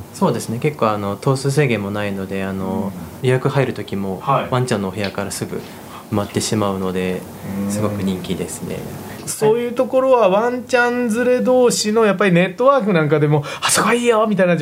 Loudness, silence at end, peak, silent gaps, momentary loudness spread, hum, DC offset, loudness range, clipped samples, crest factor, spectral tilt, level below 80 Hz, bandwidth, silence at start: -18 LUFS; 0 s; 0 dBFS; none; 11 LU; none; under 0.1%; 7 LU; under 0.1%; 18 dB; -5 dB/octave; -54 dBFS; 16 kHz; 0 s